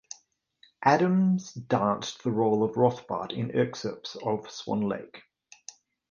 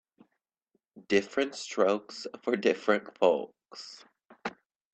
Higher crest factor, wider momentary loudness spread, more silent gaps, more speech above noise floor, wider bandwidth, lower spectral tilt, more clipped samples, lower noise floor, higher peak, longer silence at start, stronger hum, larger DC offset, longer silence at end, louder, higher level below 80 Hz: about the same, 20 dB vs 22 dB; first, 22 LU vs 18 LU; neither; second, 37 dB vs 51 dB; second, 7.2 kHz vs 8.8 kHz; first, -6.5 dB/octave vs -4 dB/octave; neither; second, -64 dBFS vs -81 dBFS; about the same, -8 dBFS vs -10 dBFS; second, 0.8 s vs 0.95 s; neither; neither; first, 0.9 s vs 0.45 s; about the same, -28 LUFS vs -29 LUFS; first, -66 dBFS vs -76 dBFS